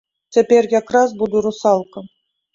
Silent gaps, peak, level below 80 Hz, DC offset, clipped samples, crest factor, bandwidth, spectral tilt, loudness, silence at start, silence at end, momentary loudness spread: none; -2 dBFS; -60 dBFS; under 0.1%; under 0.1%; 16 dB; 7.6 kHz; -5 dB/octave; -16 LUFS; 0.35 s; 0.45 s; 7 LU